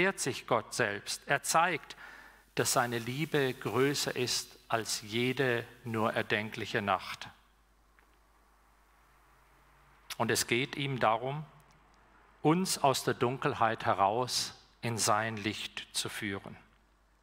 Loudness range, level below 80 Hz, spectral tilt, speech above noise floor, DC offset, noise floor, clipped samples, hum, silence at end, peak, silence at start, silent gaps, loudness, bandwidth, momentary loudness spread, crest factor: 6 LU; -68 dBFS; -3.5 dB/octave; 34 dB; under 0.1%; -66 dBFS; under 0.1%; none; 0.65 s; -12 dBFS; 0 s; none; -32 LUFS; 16 kHz; 10 LU; 22 dB